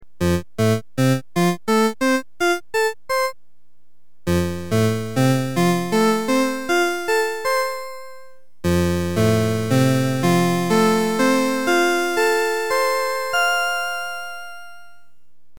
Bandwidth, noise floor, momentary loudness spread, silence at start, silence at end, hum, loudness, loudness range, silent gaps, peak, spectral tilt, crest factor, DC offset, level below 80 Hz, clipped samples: 19 kHz; -69 dBFS; 8 LU; 0 s; 0.8 s; none; -20 LUFS; 4 LU; none; -6 dBFS; -5.5 dB/octave; 14 dB; 2%; -48 dBFS; under 0.1%